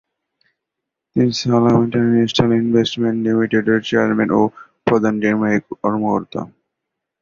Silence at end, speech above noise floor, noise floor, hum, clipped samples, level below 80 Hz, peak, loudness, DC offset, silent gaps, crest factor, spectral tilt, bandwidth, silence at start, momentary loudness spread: 0.75 s; 65 dB; -81 dBFS; none; under 0.1%; -52 dBFS; -2 dBFS; -17 LUFS; under 0.1%; none; 16 dB; -6.5 dB/octave; 7.4 kHz; 1.15 s; 7 LU